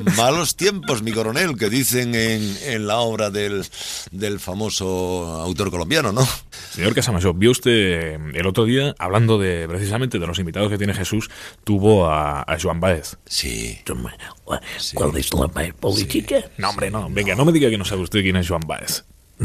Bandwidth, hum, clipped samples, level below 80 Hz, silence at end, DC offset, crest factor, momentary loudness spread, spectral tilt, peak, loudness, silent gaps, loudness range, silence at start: 15.5 kHz; none; under 0.1%; -38 dBFS; 0 s; under 0.1%; 18 dB; 10 LU; -4.5 dB/octave; -2 dBFS; -20 LUFS; none; 4 LU; 0 s